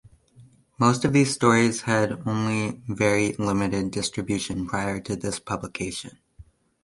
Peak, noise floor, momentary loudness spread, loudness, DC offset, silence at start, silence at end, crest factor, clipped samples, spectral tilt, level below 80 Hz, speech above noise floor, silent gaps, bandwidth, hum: -4 dBFS; -54 dBFS; 11 LU; -24 LUFS; under 0.1%; 0.4 s; 0.4 s; 20 dB; under 0.1%; -5 dB/octave; -50 dBFS; 30 dB; none; 11.5 kHz; none